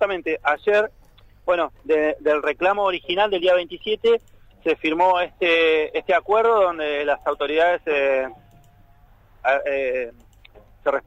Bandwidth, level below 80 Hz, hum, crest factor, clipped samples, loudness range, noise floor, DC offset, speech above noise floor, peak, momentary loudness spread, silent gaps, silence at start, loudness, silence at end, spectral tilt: 8 kHz; -52 dBFS; none; 16 dB; under 0.1%; 4 LU; -52 dBFS; under 0.1%; 31 dB; -6 dBFS; 7 LU; none; 0 s; -21 LUFS; 0.05 s; -4.5 dB/octave